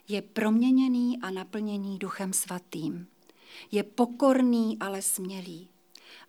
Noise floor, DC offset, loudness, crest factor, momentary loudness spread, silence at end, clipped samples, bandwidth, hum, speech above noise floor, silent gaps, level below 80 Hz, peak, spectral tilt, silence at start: -53 dBFS; under 0.1%; -28 LUFS; 18 dB; 14 LU; 0.1 s; under 0.1%; 18 kHz; none; 25 dB; none; under -90 dBFS; -10 dBFS; -4.5 dB/octave; 0.1 s